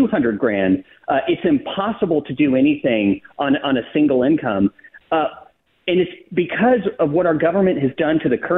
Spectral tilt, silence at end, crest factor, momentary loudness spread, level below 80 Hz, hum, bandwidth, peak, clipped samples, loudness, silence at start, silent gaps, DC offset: -10.5 dB/octave; 0 s; 12 dB; 6 LU; -54 dBFS; none; 3.9 kHz; -6 dBFS; under 0.1%; -19 LUFS; 0 s; none; under 0.1%